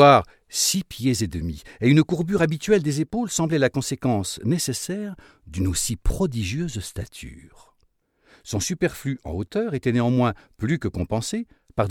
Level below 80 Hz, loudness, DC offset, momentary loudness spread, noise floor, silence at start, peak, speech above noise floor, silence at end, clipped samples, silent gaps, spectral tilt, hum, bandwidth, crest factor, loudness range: -38 dBFS; -24 LUFS; under 0.1%; 12 LU; -66 dBFS; 0 s; -2 dBFS; 43 dB; 0 s; under 0.1%; none; -5 dB/octave; none; 17 kHz; 22 dB; 7 LU